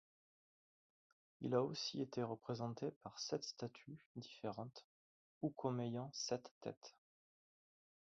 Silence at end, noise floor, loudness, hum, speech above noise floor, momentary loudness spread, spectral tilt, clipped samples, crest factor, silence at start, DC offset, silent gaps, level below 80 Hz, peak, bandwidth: 1.2 s; under -90 dBFS; -46 LUFS; none; over 45 dB; 14 LU; -5.5 dB/octave; under 0.1%; 22 dB; 1.4 s; under 0.1%; 2.96-3.01 s, 4.06-4.15 s, 4.84-5.41 s, 6.51-6.61 s, 6.77-6.81 s; -84 dBFS; -24 dBFS; 7.6 kHz